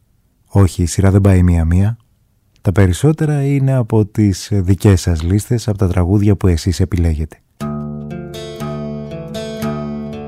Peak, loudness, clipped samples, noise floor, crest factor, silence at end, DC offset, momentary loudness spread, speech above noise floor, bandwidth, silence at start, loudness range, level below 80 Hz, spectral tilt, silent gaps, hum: -2 dBFS; -15 LUFS; under 0.1%; -56 dBFS; 14 dB; 0 s; under 0.1%; 14 LU; 44 dB; 14 kHz; 0.55 s; 7 LU; -30 dBFS; -7 dB/octave; none; none